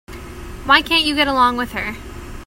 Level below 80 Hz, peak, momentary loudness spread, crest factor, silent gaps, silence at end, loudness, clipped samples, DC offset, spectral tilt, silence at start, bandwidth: -36 dBFS; 0 dBFS; 21 LU; 18 dB; none; 0 s; -16 LUFS; under 0.1%; under 0.1%; -3.5 dB/octave; 0.1 s; 16.5 kHz